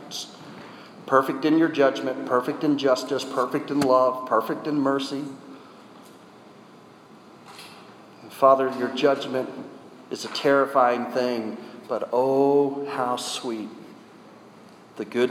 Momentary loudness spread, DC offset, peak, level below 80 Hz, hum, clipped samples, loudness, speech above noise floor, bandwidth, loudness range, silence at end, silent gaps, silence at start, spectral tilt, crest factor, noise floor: 22 LU; under 0.1%; -4 dBFS; -76 dBFS; none; under 0.1%; -23 LUFS; 26 dB; 19 kHz; 6 LU; 0 s; none; 0 s; -5 dB/octave; 20 dB; -49 dBFS